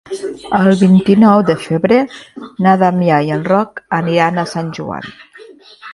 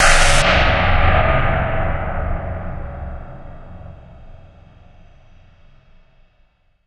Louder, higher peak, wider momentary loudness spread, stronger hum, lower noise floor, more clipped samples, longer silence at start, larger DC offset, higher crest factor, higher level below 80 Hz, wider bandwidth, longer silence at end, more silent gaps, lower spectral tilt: first, -13 LUFS vs -17 LUFS; about the same, 0 dBFS vs 0 dBFS; second, 15 LU vs 25 LU; neither; second, -39 dBFS vs -57 dBFS; neither; about the same, 0.1 s vs 0 s; neither; about the same, 14 dB vs 18 dB; second, -52 dBFS vs -22 dBFS; about the same, 11.5 kHz vs 12 kHz; second, 0 s vs 2.55 s; neither; first, -7.5 dB/octave vs -3.5 dB/octave